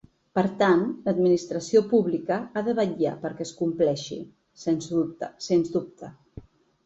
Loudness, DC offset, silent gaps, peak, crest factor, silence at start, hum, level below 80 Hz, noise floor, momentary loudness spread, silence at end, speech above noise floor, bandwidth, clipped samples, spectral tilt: -25 LUFS; under 0.1%; none; -8 dBFS; 18 dB; 0.35 s; none; -62 dBFS; -47 dBFS; 14 LU; 0.45 s; 22 dB; 8 kHz; under 0.1%; -6 dB/octave